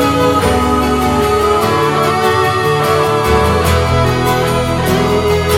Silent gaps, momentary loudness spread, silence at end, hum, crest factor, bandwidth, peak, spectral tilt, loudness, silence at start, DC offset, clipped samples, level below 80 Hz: none; 2 LU; 0 s; none; 12 dB; 17 kHz; 0 dBFS; -5.5 dB/octave; -12 LUFS; 0 s; 0.4%; under 0.1%; -26 dBFS